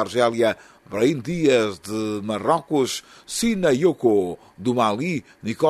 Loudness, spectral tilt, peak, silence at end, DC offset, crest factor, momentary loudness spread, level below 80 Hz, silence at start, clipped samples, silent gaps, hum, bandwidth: -22 LUFS; -5 dB/octave; -4 dBFS; 0 s; under 0.1%; 16 dB; 11 LU; -56 dBFS; 0 s; under 0.1%; none; none; 13.5 kHz